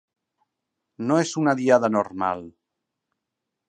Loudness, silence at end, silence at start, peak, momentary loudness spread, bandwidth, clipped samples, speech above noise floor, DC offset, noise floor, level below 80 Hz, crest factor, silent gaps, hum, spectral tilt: -22 LUFS; 1.2 s; 1 s; -4 dBFS; 10 LU; 9.6 kHz; under 0.1%; 61 dB; under 0.1%; -83 dBFS; -66 dBFS; 22 dB; none; none; -5.5 dB/octave